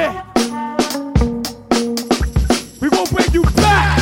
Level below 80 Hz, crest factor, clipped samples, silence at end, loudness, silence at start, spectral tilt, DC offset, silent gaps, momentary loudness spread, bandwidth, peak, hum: -24 dBFS; 14 dB; under 0.1%; 0 s; -16 LUFS; 0 s; -5 dB/octave; under 0.1%; none; 7 LU; 17 kHz; -2 dBFS; none